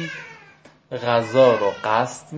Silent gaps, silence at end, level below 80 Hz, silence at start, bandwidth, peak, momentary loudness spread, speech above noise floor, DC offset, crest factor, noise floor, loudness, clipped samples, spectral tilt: none; 0 s; -64 dBFS; 0 s; 8 kHz; -4 dBFS; 19 LU; 31 dB; under 0.1%; 18 dB; -50 dBFS; -19 LUFS; under 0.1%; -5 dB/octave